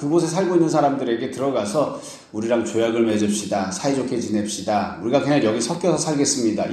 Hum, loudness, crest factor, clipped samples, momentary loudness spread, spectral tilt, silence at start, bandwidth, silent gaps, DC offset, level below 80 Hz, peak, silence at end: none; -21 LUFS; 16 dB; under 0.1%; 5 LU; -5 dB/octave; 0 s; 13 kHz; none; under 0.1%; -60 dBFS; -4 dBFS; 0 s